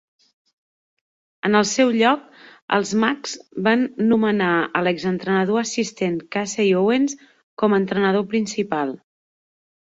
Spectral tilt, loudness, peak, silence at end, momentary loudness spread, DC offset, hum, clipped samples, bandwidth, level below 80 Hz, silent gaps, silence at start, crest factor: -4.5 dB/octave; -20 LUFS; -2 dBFS; 0.85 s; 8 LU; under 0.1%; none; under 0.1%; 8 kHz; -64 dBFS; 2.62-2.68 s, 7.43-7.57 s; 1.45 s; 20 dB